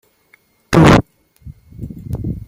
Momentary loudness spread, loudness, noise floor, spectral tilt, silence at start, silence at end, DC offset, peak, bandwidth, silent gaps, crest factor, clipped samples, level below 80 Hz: 24 LU; -12 LUFS; -55 dBFS; -6.5 dB/octave; 0.7 s; 0.1 s; under 0.1%; 0 dBFS; 15.5 kHz; none; 16 dB; under 0.1%; -32 dBFS